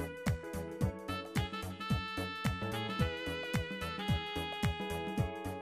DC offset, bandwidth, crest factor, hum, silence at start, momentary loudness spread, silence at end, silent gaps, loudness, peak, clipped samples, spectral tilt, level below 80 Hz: under 0.1%; 15.5 kHz; 18 dB; none; 0 s; 4 LU; 0 s; none; -37 LUFS; -18 dBFS; under 0.1%; -5.5 dB/octave; -48 dBFS